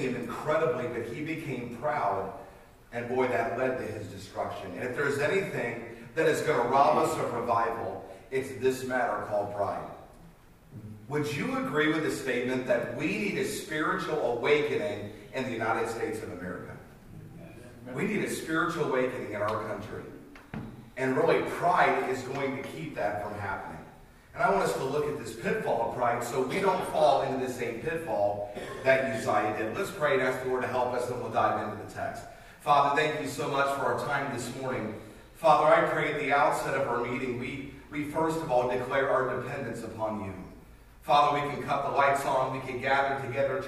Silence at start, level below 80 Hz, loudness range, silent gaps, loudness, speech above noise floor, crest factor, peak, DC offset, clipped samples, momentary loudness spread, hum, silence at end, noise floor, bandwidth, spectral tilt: 0 s; -58 dBFS; 5 LU; none; -29 LUFS; 25 dB; 20 dB; -8 dBFS; under 0.1%; under 0.1%; 15 LU; none; 0 s; -54 dBFS; 15.5 kHz; -5 dB/octave